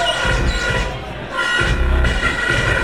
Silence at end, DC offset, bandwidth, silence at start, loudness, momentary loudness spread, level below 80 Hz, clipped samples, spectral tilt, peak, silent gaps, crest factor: 0 s; 0.7%; 12.5 kHz; 0 s; -18 LUFS; 7 LU; -22 dBFS; under 0.1%; -4 dB/octave; -4 dBFS; none; 14 dB